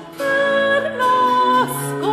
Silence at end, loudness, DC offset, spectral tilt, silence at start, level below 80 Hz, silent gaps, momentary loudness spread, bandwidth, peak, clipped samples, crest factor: 0 s; -17 LUFS; under 0.1%; -4 dB/octave; 0 s; -62 dBFS; none; 6 LU; 15.5 kHz; -6 dBFS; under 0.1%; 12 dB